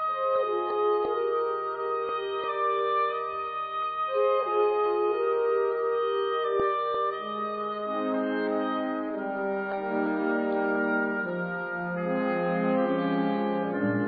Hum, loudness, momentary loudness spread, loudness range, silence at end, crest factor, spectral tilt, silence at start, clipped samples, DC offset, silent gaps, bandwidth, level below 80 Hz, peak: none; -28 LUFS; 6 LU; 3 LU; 0 s; 14 dB; -10 dB/octave; 0 s; under 0.1%; under 0.1%; none; 4.9 kHz; -68 dBFS; -14 dBFS